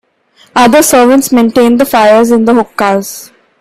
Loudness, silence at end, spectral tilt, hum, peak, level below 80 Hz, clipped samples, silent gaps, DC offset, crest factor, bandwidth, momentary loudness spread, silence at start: -7 LUFS; 0.35 s; -4 dB/octave; none; 0 dBFS; -46 dBFS; under 0.1%; none; under 0.1%; 8 dB; 16.5 kHz; 10 LU; 0.55 s